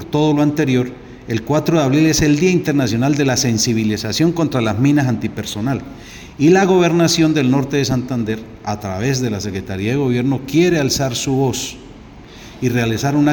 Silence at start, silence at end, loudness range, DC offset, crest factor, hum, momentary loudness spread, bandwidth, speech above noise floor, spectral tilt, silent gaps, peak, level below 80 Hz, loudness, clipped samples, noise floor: 0 s; 0 s; 3 LU; under 0.1%; 14 dB; none; 11 LU; 19.5 kHz; 22 dB; -5.5 dB/octave; none; -2 dBFS; -42 dBFS; -16 LUFS; under 0.1%; -38 dBFS